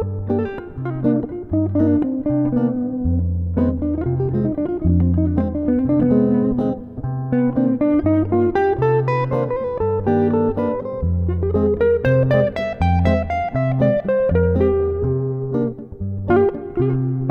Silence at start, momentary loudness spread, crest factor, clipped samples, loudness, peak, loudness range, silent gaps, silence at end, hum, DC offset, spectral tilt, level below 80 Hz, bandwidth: 0 s; 6 LU; 14 dB; under 0.1%; -19 LUFS; -4 dBFS; 2 LU; none; 0 s; none; under 0.1%; -10.5 dB/octave; -34 dBFS; 5.6 kHz